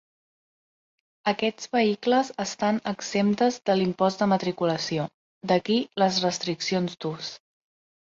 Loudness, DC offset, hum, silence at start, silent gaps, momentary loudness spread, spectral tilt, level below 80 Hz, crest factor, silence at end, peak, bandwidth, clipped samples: -25 LUFS; under 0.1%; none; 1.25 s; 5.14-5.41 s; 8 LU; -5 dB/octave; -68 dBFS; 18 dB; 0.85 s; -8 dBFS; 7.8 kHz; under 0.1%